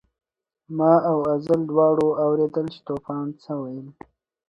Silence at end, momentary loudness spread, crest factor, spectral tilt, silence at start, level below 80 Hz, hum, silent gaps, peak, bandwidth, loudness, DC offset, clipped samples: 0.6 s; 13 LU; 20 dB; -9.5 dB/octave; 0.7 s; -62 dBFS; none; none; -4 dBFS; 7 kHz; -22 LUFS; under 0.1%; under 0.1%